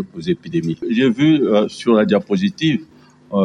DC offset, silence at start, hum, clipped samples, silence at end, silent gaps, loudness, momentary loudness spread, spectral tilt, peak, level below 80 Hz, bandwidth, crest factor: under 0.1%; 0 s; none; under 0.1%; 0 s; none; -17 LUFS; 9 LU; -7 dB/octave; -2 dBFS; -56 dBFS; 10.5 kHz; 14 dB